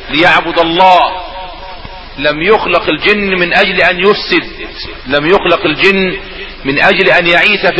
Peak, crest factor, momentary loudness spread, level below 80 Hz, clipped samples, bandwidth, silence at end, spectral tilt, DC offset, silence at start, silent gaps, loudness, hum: 0 dBFS; 10 dB; 18 LU; -34 dBFS; 0.5%; 8 kHz; 0 s; -5.5 dB/octave; under 0.1%; 0 s; none; -9 LUFS; none